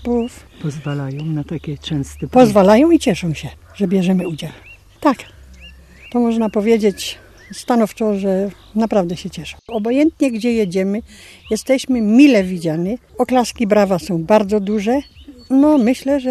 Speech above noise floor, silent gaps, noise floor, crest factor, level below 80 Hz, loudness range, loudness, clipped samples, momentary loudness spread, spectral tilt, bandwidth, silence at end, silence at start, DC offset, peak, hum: 25 dB; none; -40 dBFS; 16 dB; -44 dBFS; 5 LU; -16 LUFS; under 0.1%; 15 LU; -6.5 dB/octave; 14 kHz; 0 s; 0 s; under 0.1%; 0 dBFS; none